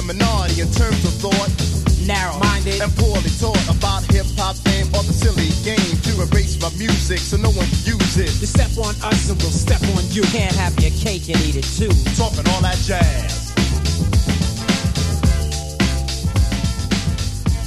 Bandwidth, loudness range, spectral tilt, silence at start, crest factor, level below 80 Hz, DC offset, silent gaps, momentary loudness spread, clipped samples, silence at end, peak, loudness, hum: 13 kHz; 1 LU; -5 dB/octave; 0 s; 16 dB; -22 dBFS; 0.6%; none; 3 LU; under 0.1%; 0 s; 0 dBFS; -18 LUFS; none